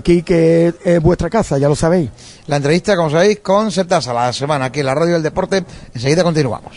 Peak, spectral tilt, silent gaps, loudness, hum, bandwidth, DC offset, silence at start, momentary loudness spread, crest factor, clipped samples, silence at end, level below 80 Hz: 0 dBFS; -6 dB/octave; none; -15 LUFS; none; 11 kHz; under 0.1%; 0.05 s; 6 LU; 14 dB; under 0.1%; 0 s; -36 dBFS